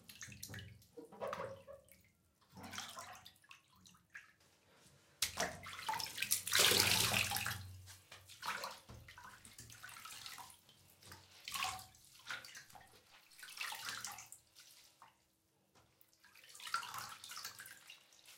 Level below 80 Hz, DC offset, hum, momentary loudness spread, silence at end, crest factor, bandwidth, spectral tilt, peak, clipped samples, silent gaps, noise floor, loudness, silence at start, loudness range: -72 dBFS; under 0.1%; none; 25 LU; 0 s; 32 dB; 17 kHz; -1 dB/octave; -12 dBFS; under 0.1%; none; -78 dBFS; -39 LUFS; 0.1 s; 16 LU